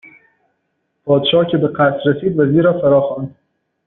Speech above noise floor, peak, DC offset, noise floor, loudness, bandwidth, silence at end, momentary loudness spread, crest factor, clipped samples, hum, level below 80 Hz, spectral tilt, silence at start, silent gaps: 55 dB; -2 dBFS; under 0.1%; -69 dBFS; -14 LUFS; 4.1 kHz; 0.55 s; 11 LU; 14 dB; under 0.1%; none; -54 dBFS; -5 dB/octave; 1.05 s; none